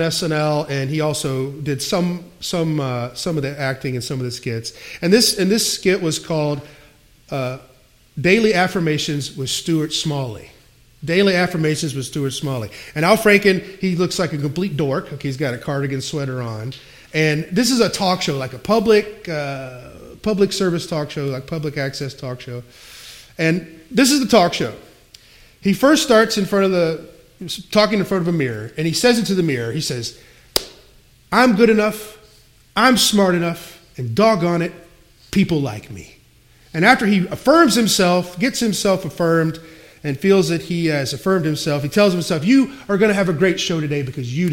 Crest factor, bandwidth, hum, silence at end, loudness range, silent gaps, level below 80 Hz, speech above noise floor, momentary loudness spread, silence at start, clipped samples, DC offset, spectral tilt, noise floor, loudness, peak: 18 dB; 16.5 kHz; none; 0 s; 6 LU; none; -50 dBFS; 33 dB; 14 LU; 0 s; under 0.1%; under 0.1%; -4.5 dB/octave; -51 dBFS; -18 LUFS; 0 dBFS